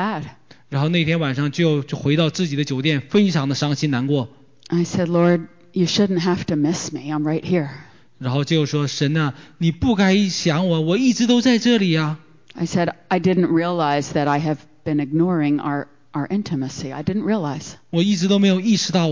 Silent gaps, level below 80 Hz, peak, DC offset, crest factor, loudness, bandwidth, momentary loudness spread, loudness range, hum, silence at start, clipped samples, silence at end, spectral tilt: none; -50 dBFS; -6 dBFS; 0.3%; 14 dB; -20 LUFS; 7.6 kHz; 9 LU; 4 LU; none; 0 s; under 0.1%; 0 s; -6 dB/octave